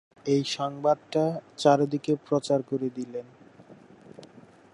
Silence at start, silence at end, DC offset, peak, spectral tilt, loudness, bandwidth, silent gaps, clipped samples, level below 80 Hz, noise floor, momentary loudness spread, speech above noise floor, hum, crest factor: 0.25 s; 0.35 s; under 0.1%; -6 dBFS; -6 dB/octave; -27 LUFS; 11.5 kHz; none; under 0.1%; -76 dBFS; -52 dBFS; 10 LU; 26 dB; none; 22 dB